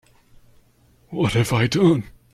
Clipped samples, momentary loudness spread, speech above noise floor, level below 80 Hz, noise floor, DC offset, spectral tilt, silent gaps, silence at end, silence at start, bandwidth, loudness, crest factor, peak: under 0.1%; 7 LU; 38 dB; -48 dBFS; -57 dBFS; under 0.1%; -6 dB/octave; none; 0.25 s; 1.1 s; 14.5 kHz; -20 LUFS; 16 dB; -6 dBFS